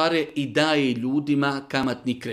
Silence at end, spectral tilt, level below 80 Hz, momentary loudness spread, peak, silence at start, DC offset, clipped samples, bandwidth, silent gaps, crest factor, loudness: 0 s; -5.5 dB/octave; -62 dBFS; 5 LU; -6 dBFS; 0 s; under 0.1%; under 0.1%; 13.5 kHz; none; 18 dB; -23 LUFS